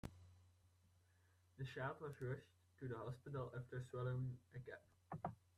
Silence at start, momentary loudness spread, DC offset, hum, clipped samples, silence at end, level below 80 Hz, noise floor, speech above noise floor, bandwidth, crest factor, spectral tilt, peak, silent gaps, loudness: 0.05 s; 12 LU; under 0.1%; none; under 0.1%; 0.2 s; -74 dBFS; -76 dBFS; 26 dB; 12 kHz; 20 dB; -7.5 dB/octave; -32 dBFS; none; -51 LUFS